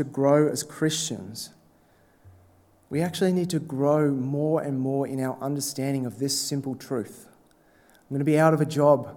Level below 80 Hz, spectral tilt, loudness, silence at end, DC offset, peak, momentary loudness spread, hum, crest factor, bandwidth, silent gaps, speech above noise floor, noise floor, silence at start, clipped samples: -70 dBFS; -5.5 dB/octave; -25 LUFS; 0 s; under 0.1%; -4 dBFS; 12 LU; none; 20 dB; 18 kHz; none; 35 dB; -60 dBFS; 0 s; under 0.1%